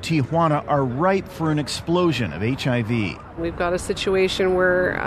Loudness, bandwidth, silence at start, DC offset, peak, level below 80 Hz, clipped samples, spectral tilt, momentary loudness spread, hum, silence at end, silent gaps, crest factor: -21 LUFS; 13.5 kHz; 0 s; under 0.1%; -6 dBFS; -44 dBFS; under 0.1%; -6 dB/octave; 6 LU; none; 0 s; none; 16 dB